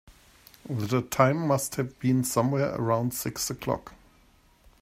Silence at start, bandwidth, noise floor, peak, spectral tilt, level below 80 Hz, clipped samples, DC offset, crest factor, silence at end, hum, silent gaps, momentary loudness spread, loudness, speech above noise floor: 0.1 s; 16 kHz; -60 dBFS; -6 dBFS; -5.5 dB/octave; -58 dBFS; under 0.1%; under 0.1%; 22 dB; 0.85 s; none; none; 10 LU; -27 LUFS; 34 dB